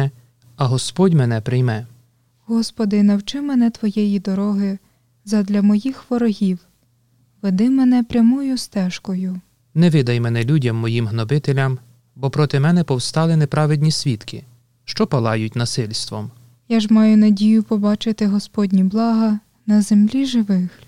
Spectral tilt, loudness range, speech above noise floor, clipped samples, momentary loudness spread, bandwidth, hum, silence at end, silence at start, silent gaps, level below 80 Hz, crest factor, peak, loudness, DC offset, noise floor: -6.5 dB/octave; 4 LU; 43 dB; under 0.1%; 9 LU; 12 kHz; none; 0.2 s; 0 s; none; -54 dBFS; 14 dB; -4 dBFS; -18 LUFS; 0.4%; -59 dBFS